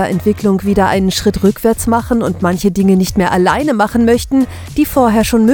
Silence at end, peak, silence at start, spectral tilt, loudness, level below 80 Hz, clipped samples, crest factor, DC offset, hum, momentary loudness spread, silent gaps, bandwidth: 0 s; 0 dBFS; 0 s; -6 dB/octave; -13 LUFS; -30 dBFS; under 0.1%; 12 dB; under 0.1%; none; 4 LU; none; 19.5 kHz